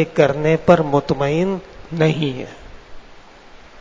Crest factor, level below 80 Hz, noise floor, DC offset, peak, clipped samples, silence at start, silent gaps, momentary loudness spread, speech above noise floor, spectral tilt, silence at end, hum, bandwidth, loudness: 18 dB; -46 dBFS; -42 dBFS; under 0.1%; 0 dBFS; under 0.1%; 0 s; none; 16 LU; 25 dB; -7 dB/octave; 0 s; none; 7.6 kHz; -18 LUFS